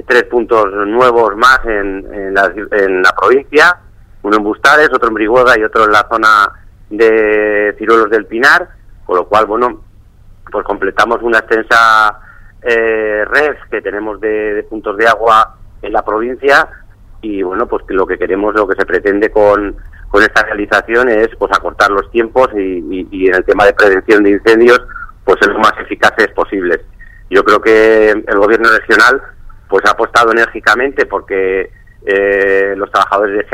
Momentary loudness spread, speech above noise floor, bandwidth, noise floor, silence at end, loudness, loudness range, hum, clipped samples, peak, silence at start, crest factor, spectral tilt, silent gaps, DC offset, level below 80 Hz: 10 LU; 28 dB; 15.5 kHz; -39 dBFS; 0 s; -10 LUFS; 4 LU; none; 0.3%; 0 dBFS; 0.1 s; 10 dB; -4 dB/octave; none; under 0.1%; -34 dBFS